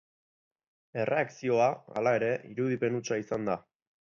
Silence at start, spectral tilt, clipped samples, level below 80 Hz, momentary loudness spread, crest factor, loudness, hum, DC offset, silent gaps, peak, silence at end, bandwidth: 0.95 s; -6 dB/octave; under 0.1%; -72 dBFS; 8 LU; 18 dB; -30 LUFS; none; under 0.1%; none; -14 dBFS; 0.55 s; 7.4 kHz